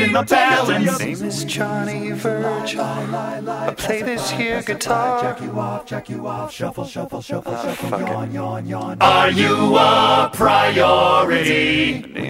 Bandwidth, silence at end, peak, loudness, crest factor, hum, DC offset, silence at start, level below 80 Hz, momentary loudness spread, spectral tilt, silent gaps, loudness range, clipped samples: 16 kHz; 0 s; -2 dBFS; -18 LUFS; 16 dB; none; under 0.1%; 0 s; -50 dBFS; 13 LU; -4.5 dB/octave; none; 11 LU; under 0.1%